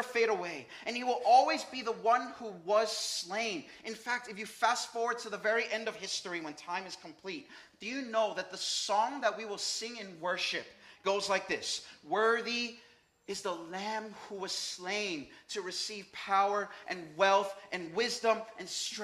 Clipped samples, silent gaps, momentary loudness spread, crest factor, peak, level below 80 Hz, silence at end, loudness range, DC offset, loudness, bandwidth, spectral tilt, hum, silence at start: under 0.1%; none; 12 LU; 22 dB; -12 dBFS; -80 dBFS; 0 s; 5 LU; under 0.1%; -33 LUFS; 15.5 kHz; -1.5 dB/octave; none; 0 s